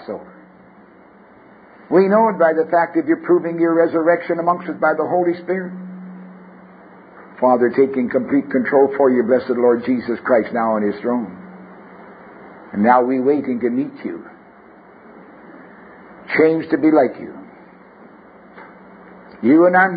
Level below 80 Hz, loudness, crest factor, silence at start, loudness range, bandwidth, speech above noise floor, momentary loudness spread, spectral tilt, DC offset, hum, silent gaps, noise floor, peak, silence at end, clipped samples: -64 dBFS; -17 LUFS; 18 dB; 0 s; 5 LU; 5 kHz; 30 dB; 18 LU; -12 dB/octave; under 0.1%; none; none; -46 dBFS; -2 dBFS; 0 s; under 0.1%